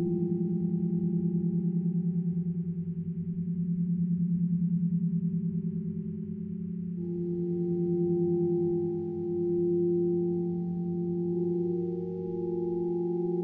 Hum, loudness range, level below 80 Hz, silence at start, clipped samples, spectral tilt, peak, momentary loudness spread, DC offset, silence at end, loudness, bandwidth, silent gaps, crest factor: none; 3 LU; -64 dBFS; 0 s; under 0.1%; -15 dB/octave; -18 dBFS; 7 LU; under 0.1%; 0 s; -30 LUFS; 0.9 kHz; none; 10 dB